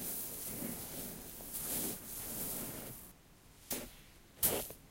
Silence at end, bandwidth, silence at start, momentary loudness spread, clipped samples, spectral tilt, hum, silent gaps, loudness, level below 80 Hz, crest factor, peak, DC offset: 0 s; 16 kHz; 0 s; 19 LU; under 0.1%; -2.5 dB/octave; none; none; -39 LUFS; -60 dBFS; 26 dB; -16 dBFS; under 0.1%